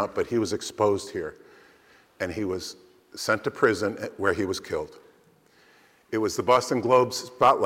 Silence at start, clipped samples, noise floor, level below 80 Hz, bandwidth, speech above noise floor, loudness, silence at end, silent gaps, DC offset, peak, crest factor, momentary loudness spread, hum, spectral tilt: 0 s; under 0.1%; -59 dBFS; -60 dBFS; 16 kHz; 34 dB; -26 LUFS; 0 s; none; under 0.1%; -8 dBFS; 18 dB; 12 LU; none; -4.5 dB/octave